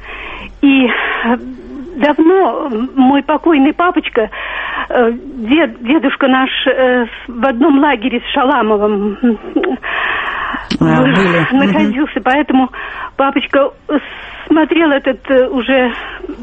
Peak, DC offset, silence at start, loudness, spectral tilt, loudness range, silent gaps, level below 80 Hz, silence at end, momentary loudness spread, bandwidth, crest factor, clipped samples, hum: 0 dBFS; under 0.1%; 0 s; -13 LUFS; -7 dB/octave; 1 LU; none; -40 dBFS; 0 s; 9 LU; 7.8 kHz; 12 dB; under 0.1%; none